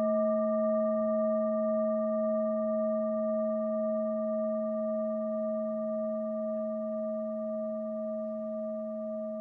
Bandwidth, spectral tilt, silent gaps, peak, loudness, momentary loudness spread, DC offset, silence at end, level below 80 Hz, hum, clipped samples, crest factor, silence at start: 2 kHz; -11.5 dB/octave; none; -20 dBFS; -32 LUFS; 7 LU; under 0.1%; 0 s; -78 dBFS; none; under 0.1%; 10 dB; 0 s